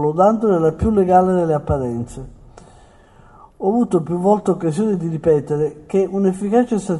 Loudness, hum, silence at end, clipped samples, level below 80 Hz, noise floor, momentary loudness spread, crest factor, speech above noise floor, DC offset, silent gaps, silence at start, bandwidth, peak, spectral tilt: -18 LUFS; none; 0 s; under 0.1%; -40 dBFS; -47 dBFS; 8 LU; 16 dB; 30 dB; under 0.1%; none; 0 s; 11.5 kHz; -2 dBFS; -8.5 dB/octave